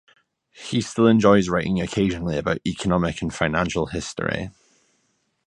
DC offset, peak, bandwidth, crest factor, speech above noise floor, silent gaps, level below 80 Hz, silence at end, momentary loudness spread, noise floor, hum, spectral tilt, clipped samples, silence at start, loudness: under 0.1%; -2 dBFS; 11 kHz; 22 dB; 48 dB; none; -44 dBFS; 0.95 s; 11 LU; -69 dBFS; none; -6 dB/octave; under 0.1%; 0.55 s; -22 LUFS